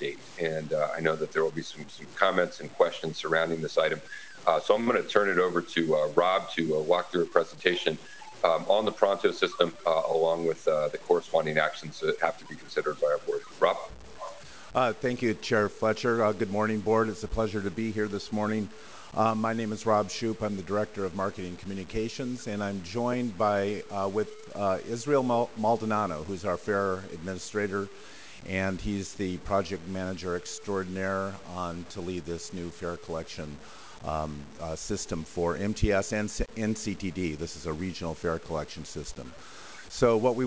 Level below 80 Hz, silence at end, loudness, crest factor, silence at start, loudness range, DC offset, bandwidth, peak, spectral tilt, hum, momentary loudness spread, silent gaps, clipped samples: -50 dBFS; 0 s; -29 LUFS; 24 dB; 0 s; 7 LU; 0.4%; 8 kHz; -6 dBFS; -5 dB/octave; none; 13 LU; none; under 0.1%